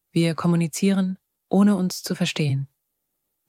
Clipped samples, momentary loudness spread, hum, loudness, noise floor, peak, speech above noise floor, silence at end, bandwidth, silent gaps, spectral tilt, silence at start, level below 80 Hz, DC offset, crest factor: under 0.1%; 9 LU; none; -22 LUFS; -77 dBFS; -6 dBFS; 56 dB; 0.85 s; 16 kHz; none; -6 dB/octave; 0.15 s; -66 dBFS; under 0.1%; 16 dB